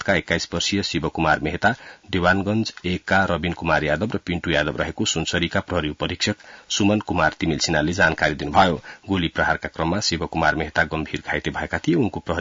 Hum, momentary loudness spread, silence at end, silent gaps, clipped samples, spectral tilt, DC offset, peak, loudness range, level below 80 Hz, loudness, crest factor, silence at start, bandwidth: none; 6 LU; 0 s; none; under 0.1%; -4.5 dB/octave; under 0.1%; -4 dBFS; 2 LU; -44 dBFS; -22 LUFS; 18 dB; 0 s; 7.8 kHz